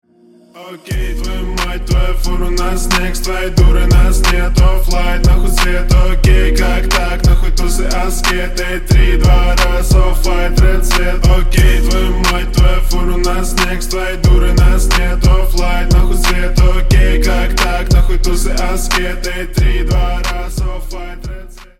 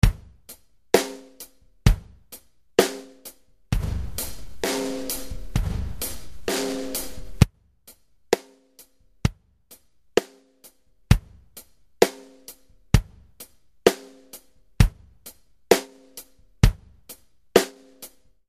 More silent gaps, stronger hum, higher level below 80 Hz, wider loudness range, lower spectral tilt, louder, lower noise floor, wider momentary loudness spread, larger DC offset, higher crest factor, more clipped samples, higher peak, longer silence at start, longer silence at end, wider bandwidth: neither; neither; first, -12 dBFS vs -32 dBFS; about the same, 3 LU vs 4 LU; about the same, -5 dB/octave vs -5 dB/octave; first, -14 LUFS vs -25 LUFS; second, -45 dBFS vs -55 dBFS; second, 8 LU vs 23 LU; neither; second, 10 dB vs 26 dB; neither; about the same, 0 dBFS vs 0 dBFS; first, 0.55 s vs 0.05 s; second, 0.15 s vs 0.4 s; about the same, 15.5 kHz vs 15 kHz